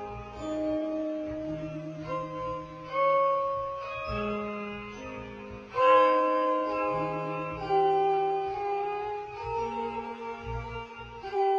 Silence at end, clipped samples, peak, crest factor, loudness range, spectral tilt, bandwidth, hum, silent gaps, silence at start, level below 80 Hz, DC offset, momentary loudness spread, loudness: 0 s; under 0.1%; -10 dBFS; 20 dB; 5 LU; -6.5 dB/octave; 7.4 kHz; none; none; 0 s; -52 dBFS; under 0.1%; 15 LU; -30 LUFS